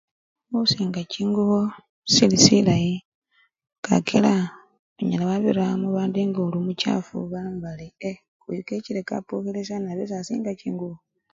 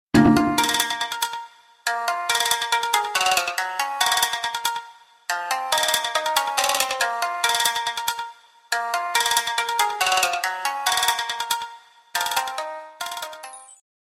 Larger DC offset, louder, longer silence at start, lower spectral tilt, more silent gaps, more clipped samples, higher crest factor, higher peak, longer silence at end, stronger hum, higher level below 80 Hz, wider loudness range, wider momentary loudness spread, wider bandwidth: neither; about the same, -23 LUFS vs -22 LUFS; first, 0.5 s vs 0.15 s; first, -4.5 dB/octave vs -2 dB/octave; first, 1.89-2.02 s, 3.05-3.22 s, 3.78-3.83 s, 4.79-4.96 s, 8.28-8.40 s vs none; neither; about the same, 24 dB vs 20 dB; about the same, 0 dBFS vs -2 dBFS; about the same, 0.4 s vs 0.4 s; neither; about the same, -58 dBFS vs -54 dBFS; first, 10 LU vs 2 LU; first, 16 LU vs 12 LU; second, 7.8 kHz vs 16.5 kHz